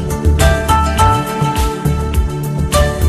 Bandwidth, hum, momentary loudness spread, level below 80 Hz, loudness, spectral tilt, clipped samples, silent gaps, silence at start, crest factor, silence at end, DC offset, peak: 15.5 kHz; none; 6 LU; -18 dBFS; -14 LUFS; -5.5 dB/octave; under 0.1%; none; 0 s; 14 dB; 0 s; under 0.1%; 0 dBFS